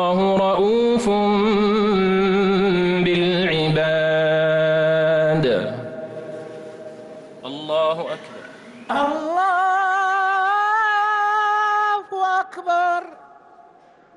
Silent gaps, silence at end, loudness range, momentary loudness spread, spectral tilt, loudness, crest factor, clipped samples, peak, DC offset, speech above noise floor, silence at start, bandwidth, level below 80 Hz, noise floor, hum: none; 1 s; 7 LU; 16 LU; -6 dB/octave; -19 LUFS; 10 dB; under 0.1%; -10 dBFS; under 0.1%; 33 dB; 0 s; 11.5 kHz; -52 dBFS; -50 dBFS; none